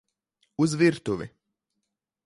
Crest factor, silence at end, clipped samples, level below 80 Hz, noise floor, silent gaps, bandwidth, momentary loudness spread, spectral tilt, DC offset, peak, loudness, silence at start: 18 dB; 0.95 s; under 0.1%; -62 dBFS; -82 dBFS; none; 11.5 kHz; 18 LU; -6 dB/octave; under 0.1%; -10 dBFS; -25 LUFS; 0.6 s